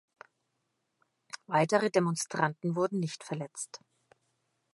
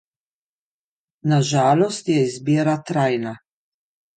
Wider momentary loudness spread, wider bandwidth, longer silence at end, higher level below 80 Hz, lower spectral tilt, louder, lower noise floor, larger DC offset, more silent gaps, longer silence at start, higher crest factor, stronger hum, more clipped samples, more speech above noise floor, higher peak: first, 17 LU vs 8 LU; first, 11.5 kHz vs 9.2 kHz; first, 1 s vs 0.8 s; second, -82 dBFS vs -66 dBFS; about the same, -5 dB/octave vs -6 dB/octave; second, -31 LUFS vs -20 LUFS; second, -80 dBFS vs under -90 dBFS; neither; neither; about the same, 1.35 s vs 1.25 s; first, 24 dB vs 16 dB; neither; neither; second, 50 dB vs over 71 dB; second, -10 dBFS vs -6 dBFS